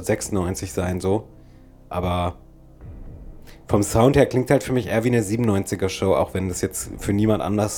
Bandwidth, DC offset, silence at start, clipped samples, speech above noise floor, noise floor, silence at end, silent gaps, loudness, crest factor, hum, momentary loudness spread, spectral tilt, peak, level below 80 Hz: 18.5 kHz; under 0.1%; 0 s; under 0.1%; 26 dB; -46 dBFS; 0 s; none; -22 LUFS; 20 dB; none; 10 LU; -6 dB/octave; -2 dBFS; -40 dBFS